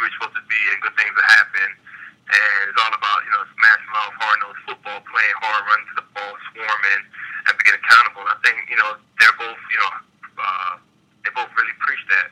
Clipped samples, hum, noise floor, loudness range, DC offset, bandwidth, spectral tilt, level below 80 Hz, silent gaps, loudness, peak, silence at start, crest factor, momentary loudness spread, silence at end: under 0.1%; none; -50 dBFS; 5 LU; under 0.1%; 16 kHz; 1 dB/octave; -76 dBFS; none; -17 LUFS; 0 dBFS; 0 s; 20 dB; 17 LU; 0 s